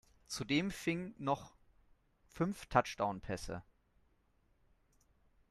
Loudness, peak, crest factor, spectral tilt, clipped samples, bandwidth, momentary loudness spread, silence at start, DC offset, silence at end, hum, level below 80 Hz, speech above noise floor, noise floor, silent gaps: -38 LUFS; -14 dBFS; 28 dB; -5 dB/octave; under 0.1%; 14 kHz; 11 LU; 0.3 s; under 0.1%; 1.9 s; none; -62 dBFS; 37 dB; -74 dBFS; none